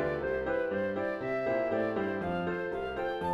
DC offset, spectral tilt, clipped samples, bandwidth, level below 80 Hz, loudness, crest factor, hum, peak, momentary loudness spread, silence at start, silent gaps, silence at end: under 0.1%; -8 dB/octave; under 0.1%; 11 kHz; -56 dBFS; -32 LUFS; 12 dB; none; -20 dBFS; 4 LU; 0 s; none; 0 s